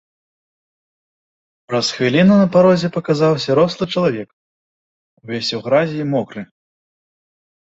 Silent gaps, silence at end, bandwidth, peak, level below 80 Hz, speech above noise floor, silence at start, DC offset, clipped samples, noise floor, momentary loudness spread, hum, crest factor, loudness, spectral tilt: 4.33-5.17 s; 1.3 s; 8 kHz; -2 dBFS; -56 dBFS; over 74 dB; 1.7 s; under 0.1%; under 0.1%; under -90 dBFS; 15 LU; none; 16 dB; -16 LUFS; -6 dB/octave